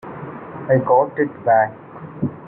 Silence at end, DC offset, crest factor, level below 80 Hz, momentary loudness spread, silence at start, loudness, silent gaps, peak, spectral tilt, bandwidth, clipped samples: 0 s; under 0.1%; 18 dB; -58 dBFS; 17 LU; 0.05 s; -18 LUFS; none; -2 dBFS; -12 dB/octave; 3.3 kHz; under 0.1%